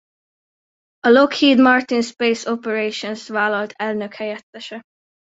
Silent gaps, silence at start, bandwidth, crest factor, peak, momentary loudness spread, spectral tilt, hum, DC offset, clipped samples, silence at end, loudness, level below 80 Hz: 4.43-4.53 s; 1.05 s; 8 kHz; 18 dB; -2 dBFS; 19 LU; -4 dB/octave; none; under 0.1%; under 0.1%; 0.5 s; -18 LUFS; -64 dBFS